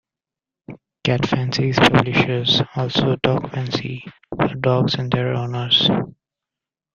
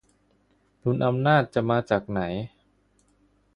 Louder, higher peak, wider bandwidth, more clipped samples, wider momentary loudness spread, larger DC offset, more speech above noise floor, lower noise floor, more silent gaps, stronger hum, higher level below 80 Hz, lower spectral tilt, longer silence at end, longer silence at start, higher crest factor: first, -19 LUFS vs -25 LUFS; first, 0 dBFS vs -6 dBFS; second, 7.4 kHz vs 10.5 kHz; neither; about the same, 10 LU vs 11 LU; neither; first, 70 dB vs 42 dB; first, -88 dBFS vs -65 dBFS; neither; second, none vs 50 Hz at -50 dBFS; first, -48 dBFS vs -56 dBFS; second, -6 dB/octave vs -8 dB/octave; second, 0.85 s vs 1.1 s; second, 0.7 s vs 0.85 s; about the same, 20 dB vs 20 dB